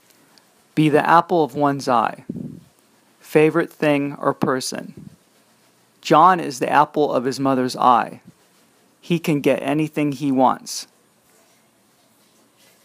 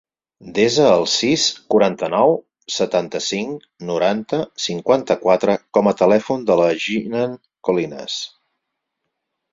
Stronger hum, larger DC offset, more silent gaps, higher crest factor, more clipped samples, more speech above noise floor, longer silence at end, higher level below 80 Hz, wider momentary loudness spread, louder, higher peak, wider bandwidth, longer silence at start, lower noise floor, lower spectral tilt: neither; neither; neither; about the same, 20 dB vs 18 dB; neither; second, 40 dB vs 59 dB; first, 2 s vs 1.25 s; second, -68 dBFS vs -60 dBFS; first, 16 LU vs 11 LU; about the same, -19 LUFS vs -18 LUFS; about the same, 0 dBFS vs -2 dBFS; first, 15.5 kHz vs 7.8 kHz; first, 0.75 s vs 0.4 s; second, -58 dBFS vs -77 dBFS; first, -5.5 dB/octave vs -4 dB/octave